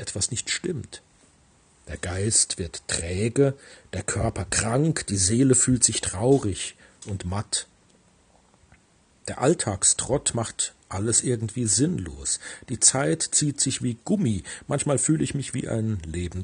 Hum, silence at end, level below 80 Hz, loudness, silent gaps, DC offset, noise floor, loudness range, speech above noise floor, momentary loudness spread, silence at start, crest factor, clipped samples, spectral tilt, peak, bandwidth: none; 0 s; -50 dBFS; -24 LUFS; none; under 0.1%; -60 dBFS; 5 LU; 36 dB; 14 LU; 0 s; 22 dB; under 0.1%; -4 dB/octave; -4 dBFS; 10.5 kHz